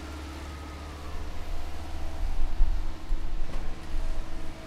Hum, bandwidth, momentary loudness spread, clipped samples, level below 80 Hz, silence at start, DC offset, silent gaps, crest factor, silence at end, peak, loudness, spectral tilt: none; 8 kHz; 7 LU; under 0.1%; -30 dBFS; 0 s; under 0.1%; none; 18 dB; 0 s; -8 dBFS; -38 LUFS; -5.5 dB/octave